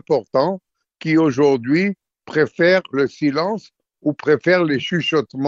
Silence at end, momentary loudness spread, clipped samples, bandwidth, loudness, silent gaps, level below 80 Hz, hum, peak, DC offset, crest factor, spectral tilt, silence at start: 0 s; 9 LU; under 0.1%; 7.6 kHz; -18 LUFS; none; -62 dBFS; none; -4 dBFS; under 0.1%; 16 dB; -6.5 dB/octave; 0.1 s